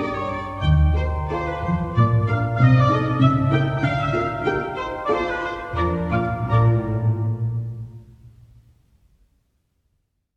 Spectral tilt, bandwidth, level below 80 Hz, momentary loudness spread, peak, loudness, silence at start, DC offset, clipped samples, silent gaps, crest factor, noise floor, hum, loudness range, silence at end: -8.5 dB/octave; 6.6 kHz; -32 dBFS; 9 LU; -4 dBFS; -21 LUFS; 0 s; under 0.1%; under 0.1%; none; 18 dB; -70 dBFS; none; 6 LU; 2.1 s